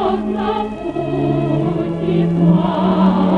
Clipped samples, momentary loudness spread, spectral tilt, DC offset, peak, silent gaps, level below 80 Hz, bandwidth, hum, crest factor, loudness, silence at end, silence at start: under 0.1%; 7 LU; -9.5 dB/octave; under 0.1%; -4 dBFS; none; -40 dBFS; 4.9 kHz; none; 12 dB; -17 LUFS; 0 s; 0 s